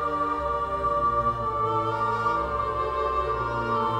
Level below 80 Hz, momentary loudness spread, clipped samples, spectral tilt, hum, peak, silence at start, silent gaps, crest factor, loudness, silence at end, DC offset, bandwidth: -42 dBFS; 3 LU; under 0.1%; -7 dB/octave; none; -14 dBFS; 0 s; none; 12 dB; -26 LUFS; 0 s; under 0.1%; 10.5 kHz